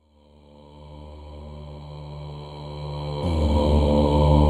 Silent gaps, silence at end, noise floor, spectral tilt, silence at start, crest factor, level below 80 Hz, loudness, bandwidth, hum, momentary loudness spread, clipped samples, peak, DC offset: none; 0 s; -54 dBFS; -8.5 dB/octave; 0.75 s; 20 dB; -28 dBFS; -22 LUFS; 9.8 kHz; none; 22 LU; under 0.1%; -4 dBFS; under 0.1%